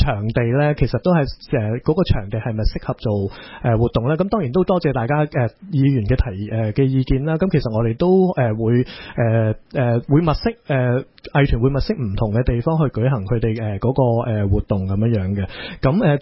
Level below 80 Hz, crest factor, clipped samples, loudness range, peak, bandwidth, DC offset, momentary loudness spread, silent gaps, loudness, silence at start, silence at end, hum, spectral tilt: -30 dBFS; 16 dB; under 0.1%; 2 LU; -2 dBFS; 5.8 kHz; under 0.1%; 6 LU; none; -19 LUFS; 0 s; 0 s; none; -12.5 dB/octave